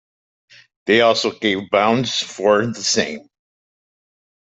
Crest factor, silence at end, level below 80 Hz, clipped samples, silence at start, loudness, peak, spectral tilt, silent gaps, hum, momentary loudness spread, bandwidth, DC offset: 18 dB; 1.3 s; -60 dBFS; under 0.1%; 0.85 s; -17 LUFS; -2 dBFS; -3.5 dB/octave; none; none; 9 LU; 8.4 kHz; under 0.1%